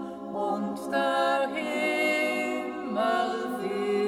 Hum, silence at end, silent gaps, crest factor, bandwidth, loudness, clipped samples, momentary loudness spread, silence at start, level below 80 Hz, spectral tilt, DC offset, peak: none; 0 s; none; 14 dB; 18.5 kHz; -28 LUFS; under 0.1%; 7 LU; 0 s; -70 dBFS; -4.5 dB/octave; under 0.1%; -14 dBFS